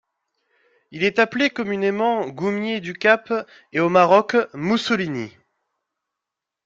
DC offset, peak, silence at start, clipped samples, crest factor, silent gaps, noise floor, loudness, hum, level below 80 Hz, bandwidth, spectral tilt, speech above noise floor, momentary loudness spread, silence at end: under 0.1%; -2 dBFS; 0.9 s; under 0.1%; 20 dB; none; -85 dBFS; -20 LUFS; none; -66 dBFS; 7.8 kHz; -5.5 dB/octave; 65 dB; 11 LU; 1.35 s